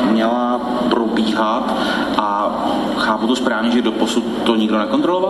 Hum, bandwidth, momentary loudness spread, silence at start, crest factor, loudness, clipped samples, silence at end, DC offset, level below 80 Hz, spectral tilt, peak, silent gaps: none; 12.5 kHz; 2 LU; 0 s; 16 dB; -17 LUFS; under 0.1%; 0 s; under 0.1%; -50 dBFS; -5 dB/octave; 0 dBFS; none